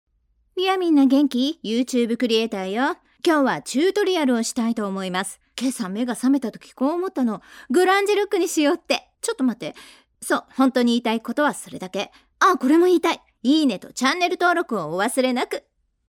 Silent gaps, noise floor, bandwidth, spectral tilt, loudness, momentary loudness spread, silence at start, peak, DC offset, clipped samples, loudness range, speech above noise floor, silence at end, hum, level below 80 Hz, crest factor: none; -63 dBFS; 16.5 kHz; -3.5 dB/octave; -21 LUFS; 11 LU; 0.55 s; -4 dBFS; under 0.1%; under 0.1%; 3 LU; 42 dB; 0.6 s; none; -68 dBFS; 18 dB